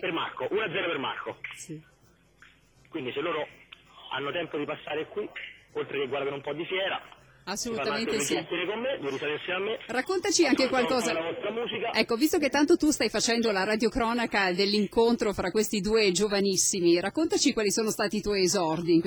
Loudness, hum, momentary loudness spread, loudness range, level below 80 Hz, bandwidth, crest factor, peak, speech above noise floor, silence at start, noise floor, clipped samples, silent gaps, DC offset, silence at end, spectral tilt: -27 LUFS; none; 13 LU; 10 LU; -56 dBFS; over 20 kHz; 18 dB; -10 dBFS; 31 dB; 0 s; -59 dBFS; under 0.1%; none; under 0.1%; 0 s; -3 dB/octave